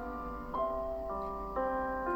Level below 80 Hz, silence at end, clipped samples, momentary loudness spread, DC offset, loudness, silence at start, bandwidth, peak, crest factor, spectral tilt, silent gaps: -48 dBFS; 0 s; under 0.1%; 5 LU; under 0.1%; -37 LUFS; 0 s; 17 kHz; -22 dBFS; 14 dB; -8 dB/octave; none